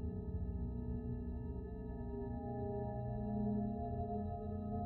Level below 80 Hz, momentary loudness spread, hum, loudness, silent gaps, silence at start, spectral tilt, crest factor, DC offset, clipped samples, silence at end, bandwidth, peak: -48 dBFS; 6 LU; 60 Hz at -50 dBFS; -43 LUFS; none; 0 s; -12 dB/octave; 12 dB; under 0.1%; under 0.1%; 0 s; 4 kHz; -28 dBFS